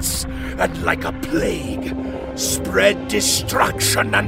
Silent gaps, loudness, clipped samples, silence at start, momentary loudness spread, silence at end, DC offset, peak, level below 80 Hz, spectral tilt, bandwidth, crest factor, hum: none; -19 LUFS; under 0.1%; 0 s; 9 LU; 0 s; under 0.1%; -2 dBFS; -34 dBFS; -3 dB/octave; 16.5 kHz; 18 dB; none